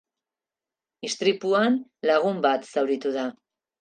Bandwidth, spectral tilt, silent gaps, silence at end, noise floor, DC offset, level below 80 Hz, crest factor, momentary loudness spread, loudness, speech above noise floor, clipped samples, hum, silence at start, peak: 9.6 kHz; -4.5 dB/octave; none; 0.5 s; under -90 dBFS; under 0.1%; -82 dBFS; 18 dB; 10 LU; -24 LUFS; over 66 dB; under 0.1%; none; 1.05 s; -8 dBFS